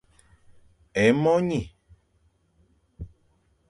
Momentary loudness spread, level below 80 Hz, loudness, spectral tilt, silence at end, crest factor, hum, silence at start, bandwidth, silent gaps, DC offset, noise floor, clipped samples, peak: 24 LU; -52 dBFS; -23 LUFS; -6.5 dB/octave; 0.65 s; 22 dB; none; 0.95 s; 11 kHz; none; under 0.1%; -66 dBFS; under 0.1%; -6 dBFS